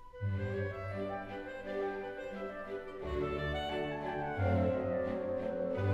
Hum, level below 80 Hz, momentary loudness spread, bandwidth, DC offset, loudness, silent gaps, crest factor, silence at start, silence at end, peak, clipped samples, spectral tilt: none; -52 dBFS; 9 LU; 7.8 kHz; under 0.1%; -37 LUFS; none; 16 dB; 0 s; 0 s; -20 dBFS; under 0.1%; -8 dB/octave